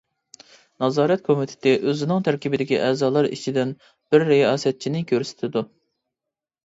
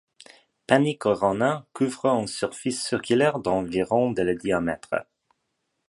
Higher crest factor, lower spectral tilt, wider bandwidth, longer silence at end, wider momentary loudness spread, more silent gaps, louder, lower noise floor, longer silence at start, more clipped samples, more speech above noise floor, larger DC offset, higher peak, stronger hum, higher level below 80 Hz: second, 18 dB vs 24 dB; about the same, -6 dB/octave vs -5 dB/octave; second, 8 kHz vs 11.5 kHz; first, 1 s vs 0.85 s; about the same, 9 LU vs 7 LU; neither; first, -21 LUFS vs -24 LUFS; first, -87 dBFS vs -77 dBFS; about the same, 0.8 s vs 0.7 s; neither; first, 66 dB vs 53 dB; neither; about the same, -4 dBFS vs -2 dBFS; neither; second, -68 dBFS vs -56 dBFS